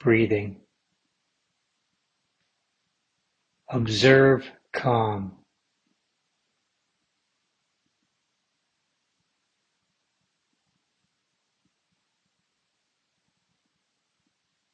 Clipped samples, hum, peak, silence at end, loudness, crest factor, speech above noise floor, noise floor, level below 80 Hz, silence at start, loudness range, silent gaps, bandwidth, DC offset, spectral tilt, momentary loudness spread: under 0.1%; none; -2 dBFS; 9.45 s; -22 LUFS; 28 dB; 56 dB; -77 dBFS; -64 dBFS; 0.05 s; 12 LU; none; 9 kHz; under 0.1%; -6 dB/octave; 17 LU